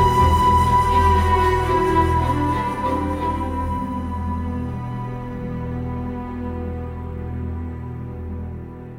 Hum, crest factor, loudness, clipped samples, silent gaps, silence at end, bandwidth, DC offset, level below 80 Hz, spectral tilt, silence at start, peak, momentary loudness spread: none; 16 dB; -21 LUFS; under 0.1%; none; 0 s; 15.5 kHz; under 0.1%; -32 dBFS; -7 dB/octave; 0 s; -4 dBFS; 15 LU